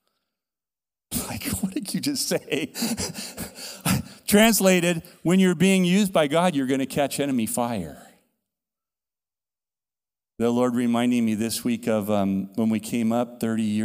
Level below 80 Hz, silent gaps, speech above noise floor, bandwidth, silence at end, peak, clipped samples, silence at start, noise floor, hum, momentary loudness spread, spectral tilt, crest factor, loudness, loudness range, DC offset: -54 dBFS; none; over 68 dB; 16 kHz; 0 s; -4 dBFS; under 0.1%; 1.1 s; under -90 dBFS; none; 10 LU; -4.5 dB/octave; 20 dB; -23 LUFS; 9 LU; under 0.1%